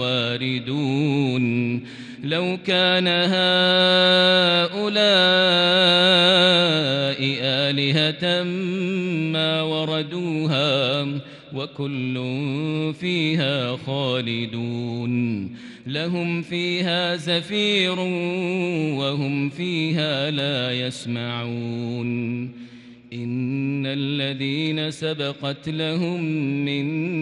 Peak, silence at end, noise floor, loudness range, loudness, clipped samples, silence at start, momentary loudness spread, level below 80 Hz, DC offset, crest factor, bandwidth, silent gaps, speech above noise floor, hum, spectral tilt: -6 dBFS; 0 s; -43 dBFS; 10 LU; -21 LUFS; under 0.1%; 0 s; 13 LU; -68 dBFS; under 0.1%; 16 dB; 11 kHz; none; 21 dB; none; -5.5 dB/octave